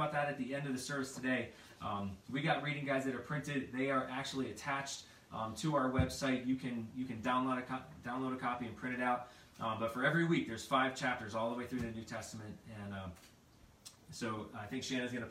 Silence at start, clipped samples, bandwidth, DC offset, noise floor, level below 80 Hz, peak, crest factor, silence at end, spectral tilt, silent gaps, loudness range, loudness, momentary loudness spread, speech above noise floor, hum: 0 s; under 0.1%; 15.5 kHz; under 0.1%; -64 dBFS; -64 dBFS; -18 dBFS; 20 dB; 0 s; -5 dB/octave; none; 7 LU; -38 LUFS; 13 LU; 25 dB; none